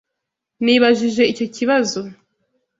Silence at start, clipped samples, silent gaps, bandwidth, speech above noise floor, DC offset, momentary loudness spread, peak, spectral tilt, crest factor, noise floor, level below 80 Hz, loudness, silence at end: 0.6 s; under 0.1%; none; 7.8 kHz; 64 dB; under 0.1%; 11 LU; 0 dBFS; -4 dB/octave; 18 dB; -80 dBFS; -62 dBFS; -17 LUFS; 0.65 s